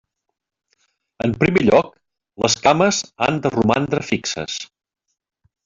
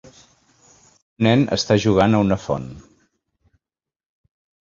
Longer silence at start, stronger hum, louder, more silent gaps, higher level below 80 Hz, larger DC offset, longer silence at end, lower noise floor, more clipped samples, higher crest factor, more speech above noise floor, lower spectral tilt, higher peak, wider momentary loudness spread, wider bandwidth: about the same, 1.25 s vs 1.2 s; neither; about the same, -18 LUFS vs -18 LUFS; neither; second, -52 dBFS vs -46 dBFS; neither; second, 1 s vs 1.9 s; second, -67 dBFS vs under -90 dBFS; neither; about the same, 18 dB vs 20 dB; second, 49 dB vs over 72 dB; second, -4.5 dB/octave vs -6 dB/octave; about the same, -2 dBFS vs -2 dBFS; about the same, 12 LU vs 11 LU; about the same, 7.8 kHz vs 7.6 kHz